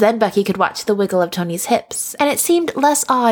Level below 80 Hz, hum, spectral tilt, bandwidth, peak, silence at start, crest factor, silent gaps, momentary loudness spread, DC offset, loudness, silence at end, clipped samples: -60 dBFS; none; -4 dB/octave; over 20 kHz; -2 dBFS; 0 s; 14 dB; none; 4 LU; under 0.1%; -17 LUFS; 0 s; under 0.1%